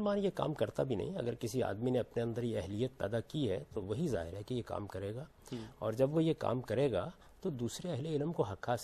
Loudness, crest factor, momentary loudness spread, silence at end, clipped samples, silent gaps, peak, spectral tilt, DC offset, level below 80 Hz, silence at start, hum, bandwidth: -37 LUFS; 20 dB; 9 LU; 0 s; under 0.1%; none; -16 dBFS; -7 dB/octave; under 0.1%; -62 dBFS; 0 s; none; 14 kHz